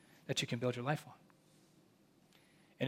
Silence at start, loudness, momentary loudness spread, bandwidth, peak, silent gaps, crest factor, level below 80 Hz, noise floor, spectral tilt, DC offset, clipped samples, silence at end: 0.25 s; -39 LUFS; 5 LU; 16 kHz; -20 dBFS; none; 22 dB; -82 dBFS; -69 dBFS; -4.5 dB/octave; under 0.1%; under 0.1%; 0 s